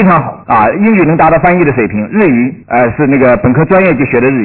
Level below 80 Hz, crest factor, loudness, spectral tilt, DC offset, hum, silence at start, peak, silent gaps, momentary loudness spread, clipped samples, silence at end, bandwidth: -36 dBFS; 8 dB; -9 LUFS; -12 dB/octave; 0.5%; none; 0 s; 0 dBFS; none; 5 LU; under 0.1%; 0 s; 4 kHz